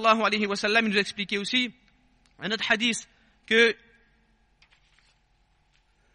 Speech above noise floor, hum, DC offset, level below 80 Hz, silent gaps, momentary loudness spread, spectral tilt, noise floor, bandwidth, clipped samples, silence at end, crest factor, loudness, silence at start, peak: 42 dB; none; under 0.1%; -64 dBFS; none; 12 LU; -3 dB/octave; -66 dBFS; 11 kHz; under 0.1%; 2.4 s; 20 dB; -24 LUFS; 0 s; -8 dBFS